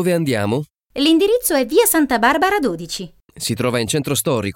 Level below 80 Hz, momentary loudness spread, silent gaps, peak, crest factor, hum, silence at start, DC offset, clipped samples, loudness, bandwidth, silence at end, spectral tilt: -48 dBFS; 12 LU; none; -4 dBFS; 14 dB; none; 0 s; under 0.1%; under 0.1%; -17 LUFS; 17 kHz; 0.05 s; -4 dB/octave